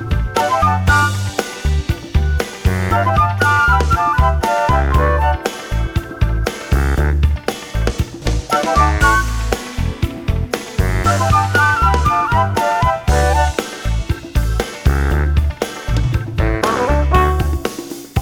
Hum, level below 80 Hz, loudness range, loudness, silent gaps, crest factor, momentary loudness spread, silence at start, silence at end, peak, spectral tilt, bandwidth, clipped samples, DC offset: none; -20 dBFS; 3 LU; -16 LUFS; none; 16 dB; 9 LU; 0 s; 0 s; 0 dBFS; -5.5 dB/octave; 18 kHz; under 0.1%; under 0.1%